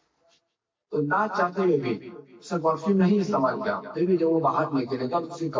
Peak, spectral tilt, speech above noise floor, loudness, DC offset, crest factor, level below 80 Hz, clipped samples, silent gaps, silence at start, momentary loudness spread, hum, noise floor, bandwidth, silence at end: -12 dBFS; -7.5 dB/octave; 56 dB; -25 LUFS; under 0.1%; 14 dB; -70 dBFS; under 0.1%; none; 0.9 s; 10 LU; none; -81 dBFS; 7.6 kHz; 0 s